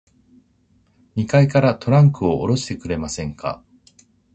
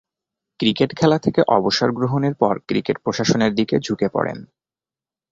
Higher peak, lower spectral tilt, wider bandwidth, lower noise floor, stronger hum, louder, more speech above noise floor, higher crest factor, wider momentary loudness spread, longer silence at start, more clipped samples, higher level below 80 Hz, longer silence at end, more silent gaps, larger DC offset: about the same, 0 dBFS vs -2 dBFS; first, -7 dB/octave vs -5.5 dB/octave; first, 8.6 kHz vs 7.8 kHz; second, -59 dBFS vs under -90 dBFS; neither; about the same, -19 LUFS vs -19 LUFS; second, 42 dB vs over 71 dB; about the same, 20 dB vs 18 dB; first, 14 LU vs 6 LU; first, 1.15 s vs 0.6 s; neither; first, -44 dBFS vs -54 dBFS; about the same, 0.8 s vs 0.85 s; neither; neither